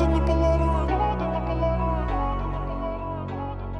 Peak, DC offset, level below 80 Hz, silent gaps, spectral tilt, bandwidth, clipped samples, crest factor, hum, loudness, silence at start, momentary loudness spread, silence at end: -10 dBFS; under 0.1%; -28 dBFS; none; -8.5 dB/octave; 6.6 kHz; under 0.1%; 14 dB; none; -26 LUFS; 0 s; 10 LU; 0 s